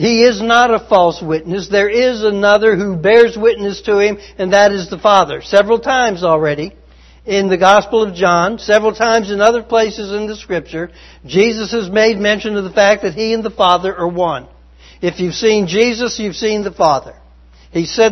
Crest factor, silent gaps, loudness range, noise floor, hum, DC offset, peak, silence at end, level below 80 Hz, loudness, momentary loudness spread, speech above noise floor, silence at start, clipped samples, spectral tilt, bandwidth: 14 dB; none; 4 LU; -43 dBFS; none; under 0.1%; 0 dBFS; 0 s; -42 dBFS; -13 LUFS; 10 LU; 30 dB; 0 s; 0.1%; -4.5 dB/octave; 7.6 kHz